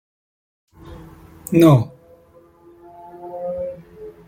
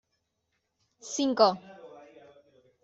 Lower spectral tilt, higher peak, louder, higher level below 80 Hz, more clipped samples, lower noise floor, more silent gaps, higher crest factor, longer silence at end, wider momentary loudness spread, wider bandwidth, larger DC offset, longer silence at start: first, -8 dB/octave vs -3.5 dB/octave; first, -2 dBFS vs -8 dBFS; first, -18 LUFS vs -26 LUFS; first, -52 dBFS vs -76 dBFS; neither; second, -51 dBFS vs -79 dBFS; neither; about the same, 20 dB vs 24 dB; second, 0.15 s vs 0.85 s; about the same, 28 LU vs 26 LU; first, 16.5 kHz vs 8.2 kHz; neither; second, 0.85 s vs 1.05 s